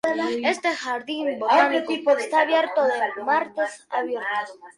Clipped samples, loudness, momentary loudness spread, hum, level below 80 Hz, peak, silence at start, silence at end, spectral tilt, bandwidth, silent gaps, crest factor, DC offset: under 0.1%; -23 LUFS; 9 LU; none; -72 dBFS; -4 dBFS; 0.05 s; 0.05 s; -2.5 dB/octave; 11.5 kHz; none; 18 dB; under 0.1%